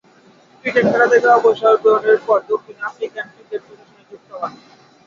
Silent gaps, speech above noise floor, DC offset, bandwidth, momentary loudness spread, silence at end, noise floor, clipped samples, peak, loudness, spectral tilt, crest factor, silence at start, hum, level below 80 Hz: none; 34 dB; under 0.1%; 7.4 kHz; 18 LU; 0.55 s; -50 dBFS; under 0.1%; -2 dBFS; -15 LUFS; -5.5 dB/octave; 16 dB; 0.65 s; none; -64 dBFS